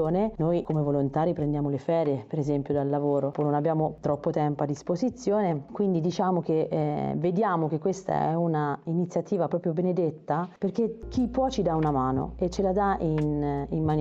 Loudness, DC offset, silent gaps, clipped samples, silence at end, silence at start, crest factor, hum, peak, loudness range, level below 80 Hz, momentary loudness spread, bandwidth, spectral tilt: -27 LUFS; under 0.1%; none; under 0.1%; 0 s; 0 s; 14 dB; none; -12 dBFS; 1 LU; -48 dBFS; 4 LU; 7.8 kHz; -8 dB/octave